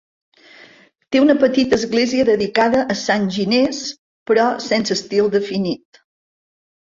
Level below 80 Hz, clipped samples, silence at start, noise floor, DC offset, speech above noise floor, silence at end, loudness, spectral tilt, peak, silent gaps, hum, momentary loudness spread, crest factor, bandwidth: -56 dBFS; under 0.1%; 1.1 s; -49 dBFS; under 0.1%; 32 dB; 1.05 s; -17 LUFS; -4.5 dB/octave; -2 dBFS; 3.99-4.26 s; none; 8 LU; 16 dB; 7.6 kHz